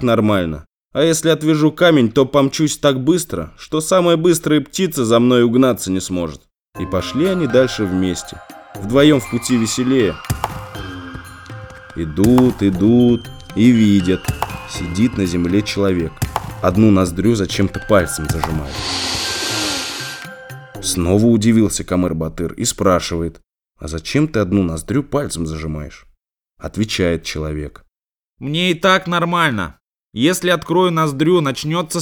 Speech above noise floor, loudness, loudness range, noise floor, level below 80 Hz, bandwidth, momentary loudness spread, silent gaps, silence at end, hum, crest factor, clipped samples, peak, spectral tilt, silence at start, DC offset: 74 dB; -16 LUFS; 6 LU; -90 dBFS; -38 dBFS; 19.5 kHz; 16 LU; 0.85-0.89 s; 0 s; none; 16 dB; under 0.1%; 0 dBFS; -5 dB/octave; 0 s; under 0.1%